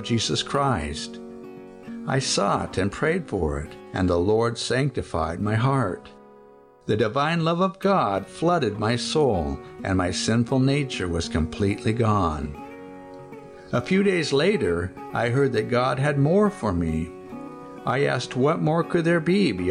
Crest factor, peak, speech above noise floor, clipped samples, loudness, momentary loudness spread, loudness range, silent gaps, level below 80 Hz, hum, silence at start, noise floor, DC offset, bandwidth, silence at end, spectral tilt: 14 dB; -10 dBFS; 28 dB; under 0.1%; -23 LUFS; 17 LU; 3 LU; none; -44 dBFS; none; 0 s; -51 dBFS; under 0.1%; 10.5 kHz; 0 s; -5.5 dB/octave